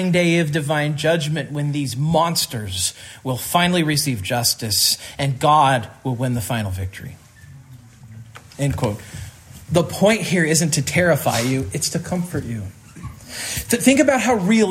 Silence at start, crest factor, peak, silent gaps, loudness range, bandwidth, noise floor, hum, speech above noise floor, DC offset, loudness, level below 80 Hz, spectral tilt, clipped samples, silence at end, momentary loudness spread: 0 s; 18 dB; -2 dBFS; none; 8 LU; 16 kHz; -43 dBFS; none; 24 dB; under 0.1%; -19 LUFS; -50 dBFS; -4 dB/octave; under 0.1%; 0 s; 15 LU